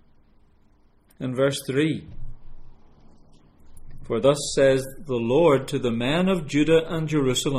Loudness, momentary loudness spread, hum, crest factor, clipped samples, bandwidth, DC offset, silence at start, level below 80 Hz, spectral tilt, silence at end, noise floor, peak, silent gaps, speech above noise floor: -23 LUFS; 10 LU; none; 18 dB; under 0.1%; 15 kHz; under 0.1%; 1.2 s; -42 dBFS; -5.5 dB/octave; 0 s; -57 dBFS; -6 dBFS; none; 35 dB